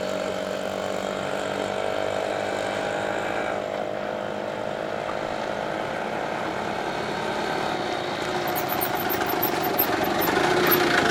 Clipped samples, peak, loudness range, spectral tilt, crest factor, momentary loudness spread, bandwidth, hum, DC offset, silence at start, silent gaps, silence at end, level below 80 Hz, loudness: under 0.1%; -6 dBFS; 5 LU; -4 dB/octave; 20 dB; 8 LU; 18 kHz; none; under 0.1%; 0 s; none; 0 s; -56 dBFS; -26 LUFS